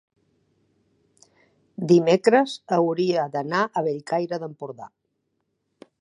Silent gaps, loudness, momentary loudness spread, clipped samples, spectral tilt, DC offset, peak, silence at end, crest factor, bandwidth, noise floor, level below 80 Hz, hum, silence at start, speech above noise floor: none; -22 LUFS; 19 LU; under 0.1%; -6.5 dB/octave; under 0.1%; -4 dBFS; 1.15 s; 22 dB; 10.5 kHz; -75 dBFS; -74 dBFS; none; 1.8 s; 53 dB